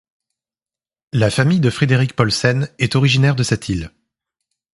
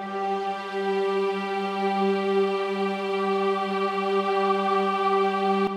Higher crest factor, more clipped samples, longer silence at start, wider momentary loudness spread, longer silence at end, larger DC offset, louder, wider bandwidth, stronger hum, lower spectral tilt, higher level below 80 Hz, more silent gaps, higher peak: about the same, 18 dB vs 14 dB; neither; first, 1.15 s vs 0 s; first, 10 LU vs 5 LU; first, 0.85 s vs 0 s; neither; first, -17 LUFS vs -25 LUFS; about the same, 11.5 kHz vs 10.5 kHz; neither; about the same, -5.5 dB/octave vs -6 dB/octave; first, -44 dBFS vs -72 dBFS; neither; first, 0 dBFS vs -12 dBFS